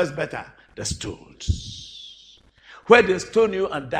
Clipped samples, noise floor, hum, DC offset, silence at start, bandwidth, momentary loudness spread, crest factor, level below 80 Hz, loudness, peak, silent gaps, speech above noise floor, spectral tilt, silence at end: under 0.1%; -52 dBFS; none; under 0.1%; 0 s; 10 kHz; 24 LU; 24 dB; -42 dBFS; -21 LUFS; 0 dBFS; none; 30 dB; -4.5 dB/octave; 0 s